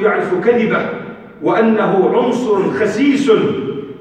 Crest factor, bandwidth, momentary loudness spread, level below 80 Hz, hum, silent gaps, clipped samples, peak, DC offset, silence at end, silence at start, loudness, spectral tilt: 14 dB; 9.4 kHz; 10 LU; -56 dBFS; none; none; under 0.1%; -2 dBFS; under 0.1%; 0 s; 0 s; -15 LUFS; -6.5 dB/octave